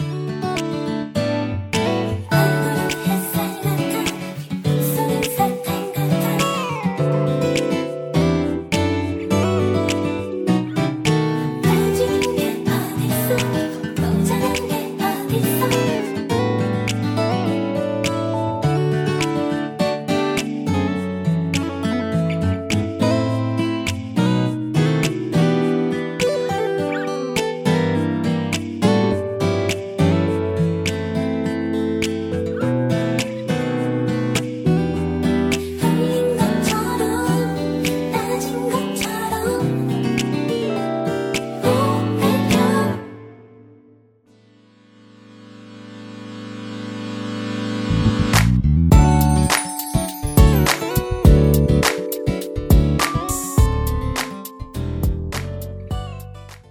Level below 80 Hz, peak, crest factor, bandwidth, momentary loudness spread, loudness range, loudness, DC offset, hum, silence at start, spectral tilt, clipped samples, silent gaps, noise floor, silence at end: -30 dBFS; 0 dBFS; 20 dB; 18 kHz; 7 LU; 4 LU; -20 LUFS; under 0.1%; none; 0 s; -6 dB/octave; under 0.1%; none; -53 dBFS; 0.1 s